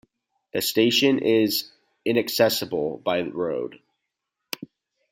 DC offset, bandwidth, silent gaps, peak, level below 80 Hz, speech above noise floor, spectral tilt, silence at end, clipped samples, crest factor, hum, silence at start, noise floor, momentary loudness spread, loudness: under 0.1%; 16.5 kHz; none; -6 dBFS; -68 dBFS; 59 dB; -4 dB/octave; 0.45 s; under 0.1%; 18 dB; none; 0.55 s; -82 dBFS; 16 LU; -23 LUFS